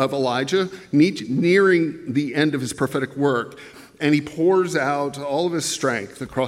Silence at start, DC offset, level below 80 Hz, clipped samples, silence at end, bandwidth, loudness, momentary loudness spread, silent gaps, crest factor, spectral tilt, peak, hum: 0 s; under 0.1%; -60 dBFS; under 0.1%; 0 s; 15.5 kHz; -21 LUFS; 7 LU; none; 16 dB; -5 dB/octave; -6 dBFS; none